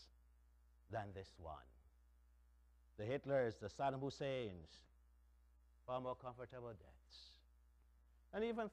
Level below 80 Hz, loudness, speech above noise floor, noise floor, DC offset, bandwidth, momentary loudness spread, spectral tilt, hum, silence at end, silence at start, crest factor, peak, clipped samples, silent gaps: -70 dBFS; -47 LUFS; 25 dB; -71 dBFS; under 0.1%; 10.5 kHz; 21 LU; -6.5 dB/octave; 60 Hz at -70 dBFS; 0 s; 0 s; 20 dB; -28 dBFS; under 0.1%; none